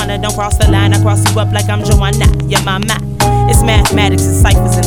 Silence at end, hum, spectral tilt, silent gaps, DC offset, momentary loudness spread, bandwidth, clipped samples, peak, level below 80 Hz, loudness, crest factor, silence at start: 0 s; none; -5 dB/octave; none; 2%; 5 LU; 18.5 kHz; under 0.1%; 0 dBFS; -16 dBFS; -11 LUFS; 10 dB; 0 s